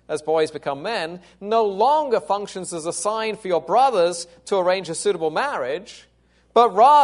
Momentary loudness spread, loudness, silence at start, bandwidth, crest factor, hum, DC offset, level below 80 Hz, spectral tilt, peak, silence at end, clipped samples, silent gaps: 10 LU; -21 LUFS; 0.1 s; 11 kHz; 18 dB; none; under 0.1%; -64 dBFS; -3.5 dB/octave; -2 dBFS; 0 s; under 0.1%; none